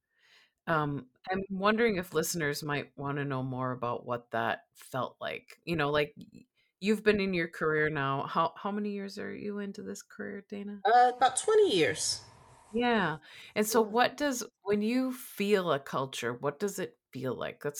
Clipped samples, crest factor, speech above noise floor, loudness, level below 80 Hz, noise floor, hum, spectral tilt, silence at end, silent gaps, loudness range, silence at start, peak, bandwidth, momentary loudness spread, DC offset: under 0.1%; 20 dB; 34 dB; -31 LUFS; -66 dBFS; -65 dBFS; none; -4.5 dB/octave; 0 s; none; 6 LU; 0.65 s; -12 dBFS; 19 kHz; 13 LU; under 0.1%